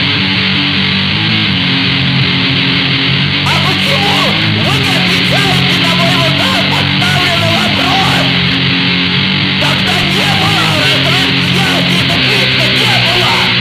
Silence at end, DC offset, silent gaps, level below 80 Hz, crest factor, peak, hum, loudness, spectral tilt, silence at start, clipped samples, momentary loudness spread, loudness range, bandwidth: 0 s; under 0.1%; none; -34 dBFS; 10 dB; 0 dBFS; none; -9 LUFS; -4.5 dB/octave; 0 s; under 0.1%; 2 LU; 1 LU; 16 kHz